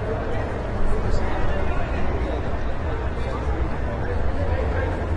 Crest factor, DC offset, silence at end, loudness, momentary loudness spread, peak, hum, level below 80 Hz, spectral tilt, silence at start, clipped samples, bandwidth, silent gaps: 14 dB; under 0.1%; 0 s; -26 LUFS; 3 LU; -8 dBFS; none; -26 dBFS; -7.5 dB/octave; 0 s; under 0.1%; 8 kHz; none